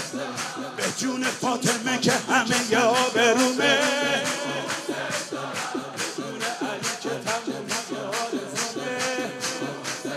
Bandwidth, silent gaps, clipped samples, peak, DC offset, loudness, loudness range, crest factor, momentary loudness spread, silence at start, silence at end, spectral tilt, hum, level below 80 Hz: 15.5 kHz; none; under 0.1%; -6 dBFS; under 0.1%; -25 LUFS; 7 LU; 20 dB; 10 LU; 0 s; 0 s; -2.5 dB/octave; none; -72 dBFS